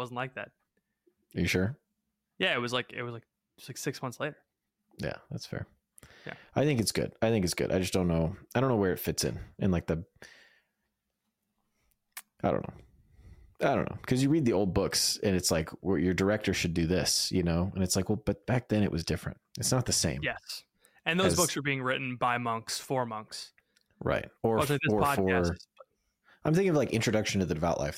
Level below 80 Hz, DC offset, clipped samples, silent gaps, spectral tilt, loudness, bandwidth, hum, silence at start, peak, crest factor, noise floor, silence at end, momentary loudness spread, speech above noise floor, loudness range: -52 dBFS; under 0.1%; under 0.1%; none; -4.5 dB/octave; -30 LUFS; 16.5 kHz; none; 0 s; -12 dBFS; 20 dB; -83 dBFS; 0 s; 15 LU; 53 dB; 9 LU